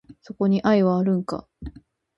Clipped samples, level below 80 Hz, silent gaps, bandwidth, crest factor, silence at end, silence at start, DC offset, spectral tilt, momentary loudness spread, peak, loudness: under 0.1%; -50 dBFS; none; 7.8 kHz; 18 dB; 0.5 s; 0.1 s; under 0.1%; -8.5 dB/octave; 22 LU; -6 dBFS; -22 LUFS